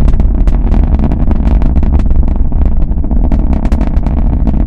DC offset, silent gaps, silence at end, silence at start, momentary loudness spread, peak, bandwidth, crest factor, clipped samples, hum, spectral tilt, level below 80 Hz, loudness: under 0.1%; none; 0 s; 0 s; 2 LU; 0 dBFS; 3.9 kHz; 8 dB; 1%; none; -10 dB/octave; -8 dBFS; -13 LUFS